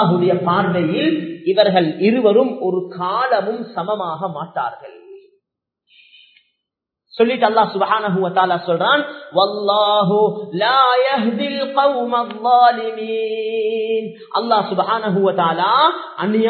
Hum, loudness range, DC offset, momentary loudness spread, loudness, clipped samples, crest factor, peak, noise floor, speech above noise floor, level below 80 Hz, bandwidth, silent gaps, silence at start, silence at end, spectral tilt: none; 8 LU; under 0.1%; 9 LU; -17 LUFS; under 0.1%; 18 dB; 0 dBFS; -81 dBFS; 65 dB; -72 dBFS; 4.6 kHz; none; 0 s; 0 s; -9 dB/octave